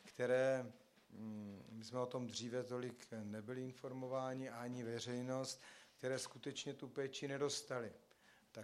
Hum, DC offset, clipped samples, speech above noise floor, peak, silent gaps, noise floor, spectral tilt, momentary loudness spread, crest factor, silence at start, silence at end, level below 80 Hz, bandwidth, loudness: none; under 0.1%; under 0.1%; 23 dB; -26 dBFS; none; -68 dBFS; -4.5 dB/octave; 14 LU; 20 dB; 0 s; 0 s; -88 dBFS; 14 kHz; -45 LUFS